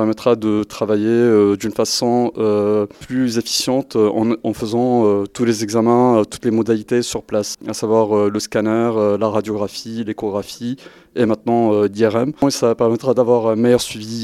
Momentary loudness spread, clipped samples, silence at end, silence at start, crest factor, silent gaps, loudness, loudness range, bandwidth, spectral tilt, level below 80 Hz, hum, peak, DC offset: 9 LU; under 0.1%; 0 s; 0 s; 16 dB; none; -17 LUFS; 3 LU; 15 kHz; -5.5 dB/octave; -54 dBFS; none; 0 dBFS; under 0.1%